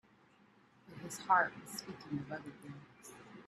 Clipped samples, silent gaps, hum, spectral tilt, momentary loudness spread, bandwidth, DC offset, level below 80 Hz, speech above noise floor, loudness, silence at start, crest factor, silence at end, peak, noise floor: under 0.1%; none; none; -4 dB/octave; 23 LU; 14 kHz; under 0.1%; -78 dBFS; 28 dB; -37 LUFS; 0.85 s; 24 dB; 0 s; -16 dBFS; -67 dBFS